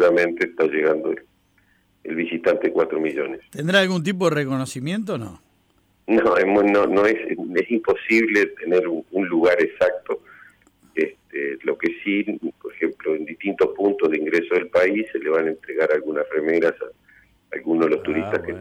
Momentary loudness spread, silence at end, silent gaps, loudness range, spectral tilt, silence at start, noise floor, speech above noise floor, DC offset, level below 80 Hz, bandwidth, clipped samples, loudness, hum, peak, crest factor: 12 LU; 0 s; none; 5 LU; -6 dB/octave; 0 s; -62 dBFS; 41 dB; under 0.1%; -62 dBFS; 14 kHz; under 0.1%; -21 LUFS; none; -6 dBFS; 16 dB